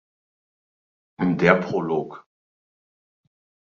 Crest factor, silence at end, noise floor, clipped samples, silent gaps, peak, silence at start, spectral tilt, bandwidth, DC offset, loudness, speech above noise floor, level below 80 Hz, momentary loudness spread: 24 dB; 1.5 s; under -90 dBFS; under 0.1%; none; -2 dBFS; 1.2 s; -7.5 dB/octave; 7.2 kHz; under 0.1%; -22 LUFS; over 69 dB; -60 dBFS; 9 LU